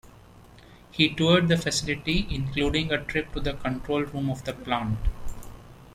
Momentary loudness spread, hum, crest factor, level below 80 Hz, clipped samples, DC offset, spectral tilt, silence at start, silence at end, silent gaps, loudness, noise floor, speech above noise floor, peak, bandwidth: 14 LU; none; 20 dB; -38 dBFS; under 0.1%; under 0.1%; -5 dB/octave; 0.05 s; 0 s; none; -26 LUFS; -50 dBFS; 25 dB; -6 dBFS; 14.5 kHz